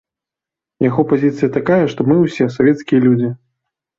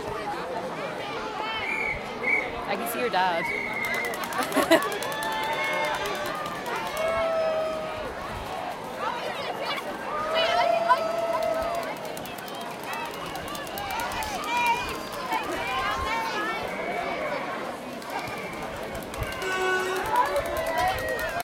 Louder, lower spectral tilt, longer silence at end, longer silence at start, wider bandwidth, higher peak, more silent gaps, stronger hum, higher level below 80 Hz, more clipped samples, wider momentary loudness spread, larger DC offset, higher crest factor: first, -15 LUFS vs -28 LUFS; first, -8.5 dB/octave vs -3.5 dB/octave; first, 0.65 s vs 0 s; first, 0.8 s vs 0 s; second, 7.4 kHz vs 17 kHz; first, -2 dBFS vs -6 dBFS; neither; neither; about the same, -54 dBFS vs -50 dBFS; neither; second, 5 LU vs 10 LU; neither; second, 14 dB vs 24 dB